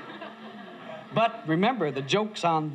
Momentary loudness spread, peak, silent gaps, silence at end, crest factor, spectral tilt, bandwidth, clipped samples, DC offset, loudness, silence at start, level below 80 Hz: 17 LU; -10 dBFS; none; 0 s; 18 dB; -5.5 dB/octave; 11.5 kHz; under 0.1%; under 0.1%; -26 LUFS; 0 s; -80 dBFS